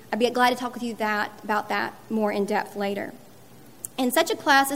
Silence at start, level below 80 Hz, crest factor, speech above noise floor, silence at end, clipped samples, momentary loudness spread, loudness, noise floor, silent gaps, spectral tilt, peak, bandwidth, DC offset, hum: 0 s; -70 dBFS; 20 dB; 25 dB; 0 s; under 0.1%; 10 LU; -25 LUFS; -50 dBFS; none; -3.5 dB/octave; -4 dBFS; 16 kHz; 0.3%; none